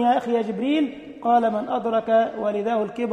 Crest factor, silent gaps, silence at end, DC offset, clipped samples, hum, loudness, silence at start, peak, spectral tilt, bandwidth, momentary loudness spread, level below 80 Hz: 14 dB; none; 0 s; under 0.1%; under 0.1%; none; -23 LUFS; 0 s; -8 dBFS; -6.5 dB/octave; 9.2 kHz; 5 LU; -64 dBFS